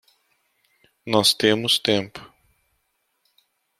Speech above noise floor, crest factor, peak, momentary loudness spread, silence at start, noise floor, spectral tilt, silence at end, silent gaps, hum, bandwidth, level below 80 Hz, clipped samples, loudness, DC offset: 52 dB; 24 dB; -2 dBFS; 23 LU; 1.05 s; -72 dBFS; -3 dB/octave; 1.55 s; none; none; 15.5 kHz; -64 dBFS; under 0.1%; -19 LUFS; under 0.1%